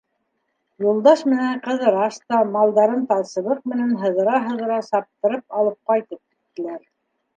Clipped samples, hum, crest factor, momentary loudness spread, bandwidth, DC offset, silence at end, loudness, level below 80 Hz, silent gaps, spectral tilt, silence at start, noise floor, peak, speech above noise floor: under 0.1%; none; 18 dB; 14 LU; 9 kHz; under 0.1%; 0.6 s; -20 LUFS; -76 dBFS; none; -6 dB/octave; 0.8 s; -73 dBFS; -2 dBFS; 53 dB